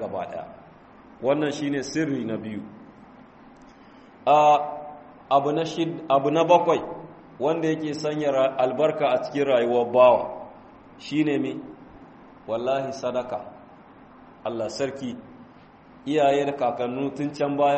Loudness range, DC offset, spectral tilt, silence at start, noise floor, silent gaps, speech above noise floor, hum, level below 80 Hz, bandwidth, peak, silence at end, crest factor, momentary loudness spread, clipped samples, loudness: 9 LU; under 0.1%; -6 dB/octave; 0 s; -50 dBFS; none; 27 dB; none; -64 dBFS; 8.4 kHz; -4 dBFS; 0 s; 20 dB; 19 LU; under 0.1%; -24 LUFS